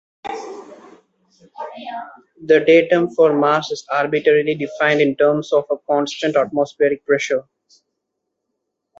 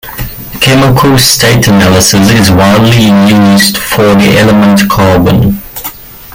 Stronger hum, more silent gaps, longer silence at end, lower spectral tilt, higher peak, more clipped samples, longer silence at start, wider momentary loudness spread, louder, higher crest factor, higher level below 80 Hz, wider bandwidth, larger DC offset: neither; neither; first, 1.6 s vs 0.05 s; about the same, -5 dB/octave vs -4.5 dB/octave; about the same, -2 dBFS vs 0 dBFS; second, under 0.1% vs 0.6%; first, 0.25 s vs 0.05 s; first, 18 LU vs 12 LU; second, -17 LUFS vs -5 LUFS; first, 16 dB vs 6 dB; second, -66 dBFS vs -28 dBFS; second, 7.8 kHz vs 17.5 kHz; neither